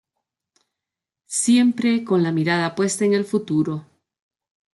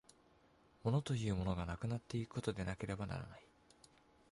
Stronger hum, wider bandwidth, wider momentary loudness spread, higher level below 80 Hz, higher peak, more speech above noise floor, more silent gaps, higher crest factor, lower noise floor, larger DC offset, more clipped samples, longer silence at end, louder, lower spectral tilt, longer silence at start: neither; about the same, 12 kHz vs 11.5 kHz; about the same, 7 LU vs 8 LU; second, -68 dBFS vs -58 dBFS; first, -6 dBFS vs -24 dBFS; first, 67 dB vs 29 dB; neither; about the same, 16 dB vs 18 dB; first, -87 dBFS vs -70 dBFS; neither; neither; about the same, 0.9 s vs 0.9 s; first, -20 LUFS vs -42 LUFS; second, -5 dB/octave vs -6.5 dB/octave; first, 1.3 s vs 0.85 s